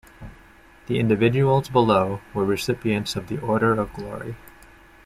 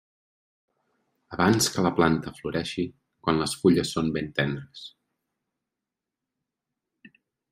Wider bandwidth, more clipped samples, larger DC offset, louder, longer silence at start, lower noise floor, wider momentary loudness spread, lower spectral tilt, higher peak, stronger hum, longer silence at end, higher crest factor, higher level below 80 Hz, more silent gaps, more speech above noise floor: about the same, 15 kHz vs 15.5 kHz; neither; neither; first, -22 LUFS vs -25 LUFS; second, 0.2 s vs 1.3 s; second, -50 dBFS vs -87 dBFS; about the same, 14 LU vs 15 LU; first, -6.5 dB/octave vs -4.5 dB/octave; about the same, -4 dBFS vs -6 dBFS; neither; second, 0.6 s vs 2.65 s; second, 18 dB vs 24 dB; first, -48 dBFS vs -56 dBFS; neither; second, 28 dB vs 62 dB